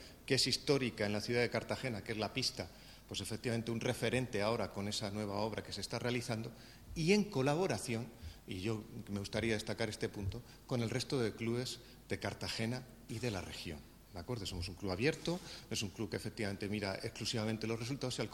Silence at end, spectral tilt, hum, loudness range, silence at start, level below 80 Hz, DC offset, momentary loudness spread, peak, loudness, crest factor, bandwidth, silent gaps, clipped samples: 0 s; -4.5 dB/octave; none; 4 LU; 0 s; -60 dBFS; under 0.1%; 11 LU; -16 dBFS; -38 LUFS; 22 dB; 18 kHz; none; under 0.1%